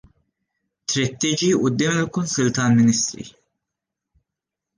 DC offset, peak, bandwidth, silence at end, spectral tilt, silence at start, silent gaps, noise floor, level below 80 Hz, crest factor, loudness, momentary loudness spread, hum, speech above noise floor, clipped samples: under 0.1%; -8 dBFS; 10 kHz; 1.5 s; -4.5 dB/octave; 0.9 s; none; -85 dBFS; -58 dBFS; 16 dB; -20 LUFS; 11 LU; none; 66 dB; under 0.1%